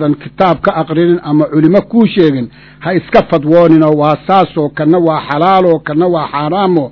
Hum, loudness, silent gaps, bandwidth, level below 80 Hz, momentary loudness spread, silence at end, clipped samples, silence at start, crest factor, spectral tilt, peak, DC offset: none; -10 LUFS; none; 6 kHz; -44 dBFS; 7 LU; 0 s; 1%; 0 s; 10 dB; -9.5 dB/octave; 0 dBFS; under 0.1%